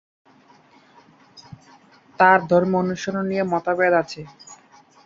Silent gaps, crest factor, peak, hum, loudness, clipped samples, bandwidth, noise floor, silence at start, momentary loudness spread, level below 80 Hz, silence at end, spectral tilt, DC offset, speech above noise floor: none; 20 dB; -2 dBFS; none; -19 LUFS; under 0.1%; 7.6 kHz; -53 dBFS; 1.35 s; 15 LU; -62 dBFS; 0.5 s; -6 dB/octave; under 0.1%; 34 dB